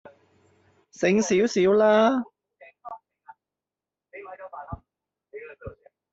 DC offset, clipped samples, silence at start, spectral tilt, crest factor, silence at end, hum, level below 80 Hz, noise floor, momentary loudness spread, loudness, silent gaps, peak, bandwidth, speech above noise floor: under 0.1%; under 0.1%; 1 s; -5 dB/octave; 20 dB; 0.45 s; none; -58 dBFS; -90 dBFS; 25 LU; -21 LUFS; none; -8 dBFS; 8 kHz; 70 dB